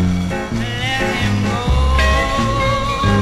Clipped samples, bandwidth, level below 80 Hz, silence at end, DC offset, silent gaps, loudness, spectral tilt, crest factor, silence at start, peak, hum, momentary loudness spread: under 0.1%; 13.5 kHz; -22 dBFS; 0 s; under 0.1%; none; -17 LUFS; -5.5 dB/octave; 14 dB; 0 s; -2 dBFS; none; 6 LU